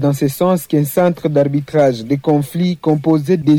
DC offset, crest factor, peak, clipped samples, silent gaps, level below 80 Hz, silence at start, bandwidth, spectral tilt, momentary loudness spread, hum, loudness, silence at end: under 0.1%; 12 dB; -4 dBFS; under 0.1%; none; -54 dBFS; 0 s; 19 kHz; -7.5 dB/octave; 2 LU; none; -15 LUFS; 0 s